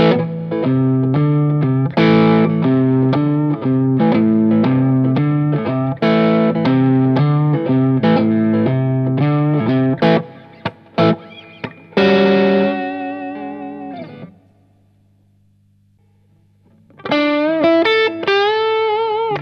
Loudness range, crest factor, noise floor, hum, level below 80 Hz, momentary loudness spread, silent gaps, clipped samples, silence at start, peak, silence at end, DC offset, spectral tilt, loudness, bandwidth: 8 LU; 16 dB; -55 dBFS; 50 Hz at -40 dBFS; -56 dBFS; 14 LU; none; under 0.1%; 0 s; 0 dBFS; 0 s; under 0.1%; -9 dB/octave; -15 LUFS; 6.2 kHz